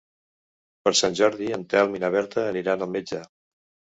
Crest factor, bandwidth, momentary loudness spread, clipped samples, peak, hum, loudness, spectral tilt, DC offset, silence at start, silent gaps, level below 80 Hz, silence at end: 20 dB; 8.2 kHz; 9 LU; under 0.1%; -4 dBFS; none; -24 LUFS; -3 dB/octave; under 0.1%; 0.85 s; none; -64 dBFS; 0.7 s